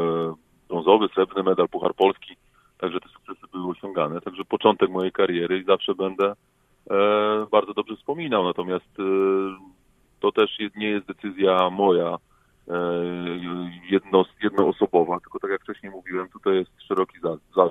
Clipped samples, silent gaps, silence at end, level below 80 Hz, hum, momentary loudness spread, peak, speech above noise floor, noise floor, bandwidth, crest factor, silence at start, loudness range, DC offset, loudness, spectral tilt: under 0.1%; none; 0 s; -64 dBFS; none; 12 LU; -2 dBFS; 38 dB; -60 dBFS; 4 kHz; 22 dB; 0 s; 2 LU; under 0.1%; -24 LUFS; -7.5 dB/octave